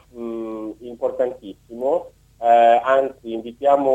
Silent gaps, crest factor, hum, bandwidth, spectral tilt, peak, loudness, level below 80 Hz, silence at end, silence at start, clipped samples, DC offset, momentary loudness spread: none; 16 dB; none; 8.4 kHz; -5.5 dB/octave; -4 dBFS; -20 LUFS; -58 dBFS; 0 s; 0.15 s; under 0.1%; under 0.1%; 17 LU